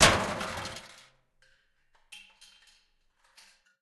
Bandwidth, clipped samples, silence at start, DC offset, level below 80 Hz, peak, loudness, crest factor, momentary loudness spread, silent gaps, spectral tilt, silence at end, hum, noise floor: 12.5 kHz; under 0.1%; 0 s; under 0.1%; -52 dBFS; -6 dBFS; -29 LUFS; 28 dB; 27 LU; none; -2 dB/octave; 1.65 s; none; -69 dBFS